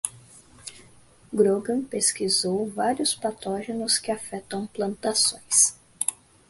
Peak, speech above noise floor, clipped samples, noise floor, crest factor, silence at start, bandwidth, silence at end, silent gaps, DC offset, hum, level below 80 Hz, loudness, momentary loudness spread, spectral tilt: -6 dBFS; 29 dB; under 0.1%; -54 dBFS; 22 dB; 0.05 s; 12 kHz; 0.35 s; none; under 0.1%; none; -64 dBFS; -24 LUFS; 13 LU; -2 dB/octave